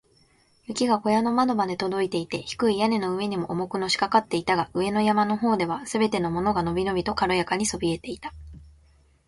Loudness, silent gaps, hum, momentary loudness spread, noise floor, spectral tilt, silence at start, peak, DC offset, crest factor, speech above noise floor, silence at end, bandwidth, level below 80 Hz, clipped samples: -25 LUFS; none; none; 7 LU; -61 dBFS; -5 dB/octave; 0.7 s; -6 dBFS; under 0.1%; 20 dB; 37 dB; 0.6 s; 11.5 kHz; -52 dBFS; under 0.1%